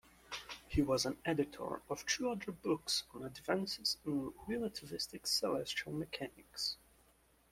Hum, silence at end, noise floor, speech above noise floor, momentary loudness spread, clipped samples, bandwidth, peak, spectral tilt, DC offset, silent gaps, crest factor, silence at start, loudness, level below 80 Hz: none; 0.75 s; -70 dBFS; 31 dB; 11 LU; under 0.1%; 16.5 kHz; -20 dBFS; -3.5 dB/octave; under 0.1%; none; 20 dB; 0.3 s; -39 LUFS; -60 dBFS